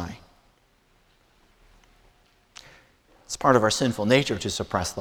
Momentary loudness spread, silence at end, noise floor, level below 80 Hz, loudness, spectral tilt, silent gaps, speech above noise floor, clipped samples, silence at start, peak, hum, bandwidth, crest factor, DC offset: 26 LU; 0 s; -63 dBFS; -52 dBFS; -23 LUFS; -4.5 dB/octave; none; 40 dB; under 0.1%; 0 s; -4 dBFS; none; 18.5 kHz; 24 dB; under 0.1%